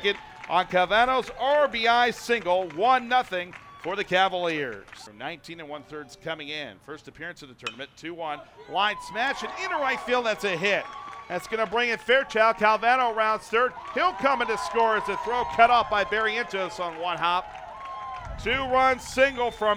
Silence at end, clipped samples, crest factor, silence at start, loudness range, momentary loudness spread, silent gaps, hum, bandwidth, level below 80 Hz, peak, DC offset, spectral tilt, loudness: 0 s; under 0.1%; 22 dB; 0 s; 9 LU; 17 LU; none; none; 15.5 kHz; -54 dBFS; -4 dBFS; under 0.1%; -3.5 dB/octave; -24 LUFS